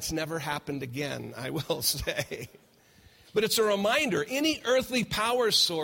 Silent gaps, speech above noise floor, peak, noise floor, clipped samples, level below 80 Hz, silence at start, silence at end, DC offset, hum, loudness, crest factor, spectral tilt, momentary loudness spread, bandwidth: none; 30 dB; -12 dBFS; -59 dBFS; under 0.1%; -54 dBFS; 0 s; 0 s; under 0.1%; none; -28 LUFS; 18 dB; -3 dB/octave; 11 LU; 16.5 kHz